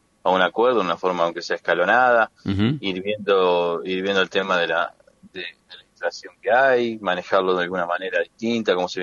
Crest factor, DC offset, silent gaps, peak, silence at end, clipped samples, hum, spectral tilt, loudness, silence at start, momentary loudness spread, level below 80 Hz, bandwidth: 18 dB; under 0.1%; none; -4 dBFS; 0 s; under 0.1%; none; -5.5 dB/octave; -21 LUFS; 0.25 s; 12 LU; -64 dBFS; 7.4 kHz